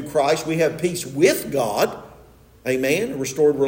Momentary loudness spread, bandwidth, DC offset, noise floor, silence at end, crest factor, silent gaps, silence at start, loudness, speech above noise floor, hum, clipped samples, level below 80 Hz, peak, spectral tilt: 7 LU; 16.5 kHz; under 0.1%; -49 dBFS; 0 s; 16 dB; none; 0 s; -21 LUFS; 28 dB; none; under 0.1%; -54 dBFS; -4 dBFS; -4.5 dB/octave